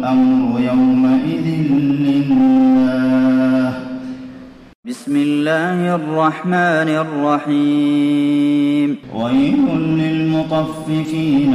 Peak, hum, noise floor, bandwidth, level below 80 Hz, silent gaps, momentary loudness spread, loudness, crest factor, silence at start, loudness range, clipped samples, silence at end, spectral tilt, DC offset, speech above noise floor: -4 dBFS; none; -36 dBFS; 11 kHz; -52 dBFS; 4.75-4.83 s; 8 LU; -15 LUFS; 12 dB; 0 s; 4 LU; under 0.1%; 0 s; -7.5 dB/octave; under 0.1%; 22 dB